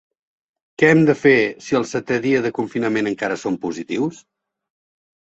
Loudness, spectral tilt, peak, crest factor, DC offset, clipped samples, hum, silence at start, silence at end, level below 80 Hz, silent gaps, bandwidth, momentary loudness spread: -19 LUFS; -6 dB/octave; -2 dBFS; 18 dB; under 0.1%; under 0.1%; none; 0.8 s; 1.05 s; -60 dBFS; none; 8.2 kHz; 10 LU